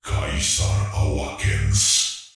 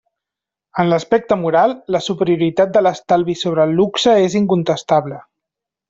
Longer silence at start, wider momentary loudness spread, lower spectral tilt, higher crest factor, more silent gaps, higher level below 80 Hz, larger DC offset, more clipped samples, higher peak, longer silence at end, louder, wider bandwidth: second, 0.05 s vs 0.75 s; about the same, 8 LU vs 6 LU; second, -2.5 dB/octave vs -6 dB/octave; about the same, 14 dB vs 14 dB; neither; first, -30 dBFS vs -56 dBFS; neither; neither; second, -6 dBFS vs -2 dBFS; second, 0.05 s vs 0.7 s; second, -20 LUFS vs -16 LUFS; first, 12 kHz vs 7.8 kHz